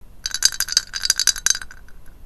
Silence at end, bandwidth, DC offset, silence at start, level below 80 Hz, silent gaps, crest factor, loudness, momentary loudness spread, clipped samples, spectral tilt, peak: 0 s; 17.5 kHz; under 0.1%; 0.05 s; -42 dBFS; none; 22 dB; -18 LUFS; 5 LU; under 0.1%; 3 dB/octave; 0 dBFS